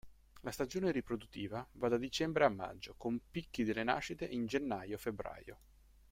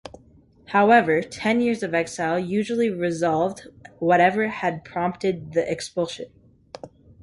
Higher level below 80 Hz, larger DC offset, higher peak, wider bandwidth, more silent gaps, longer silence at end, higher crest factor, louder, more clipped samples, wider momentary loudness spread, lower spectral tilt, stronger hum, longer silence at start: about the same, -62 dBFS vs -58 dBFS; neither; second, -14 dBFS vs -4 dBFS; first, 16 kHz vs 11.5 kHz; neither; first, 0.55 s vs 0.35 s; first, 24 dB vs 18 dB; second, -38 LUFS vs -22 LUFS; neither; about the same, 13 LU vs 12 LU; about the same, -5 dB/octave vs -5.5 dB/octave; neither; about the same, 0.05 s vs 0.05 s